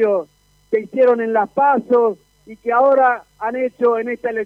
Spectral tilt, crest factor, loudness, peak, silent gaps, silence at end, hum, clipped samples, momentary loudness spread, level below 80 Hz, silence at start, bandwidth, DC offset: -7.5 dB/octave; 14 dB; -17 LUFS; -4 dBFS; none; 0 s; 50 Hz at -60 dBFS; under 0.1%; 9 LU; -62 dBFS; 0 s; 5.2 kHz; under 0.1%